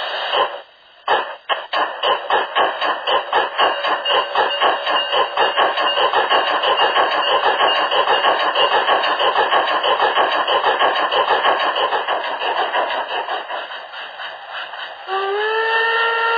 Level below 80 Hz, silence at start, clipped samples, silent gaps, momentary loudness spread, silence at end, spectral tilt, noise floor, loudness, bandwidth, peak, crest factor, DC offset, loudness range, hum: -64 dBFS; 0 s; under 0.1%; none; 10 LU; 0 s; -3 dB/octave; -42 dBFS; -17 LUFS; 5 kHz; -2 dBFS; 16 dB; under 0.1%; 6 LU; none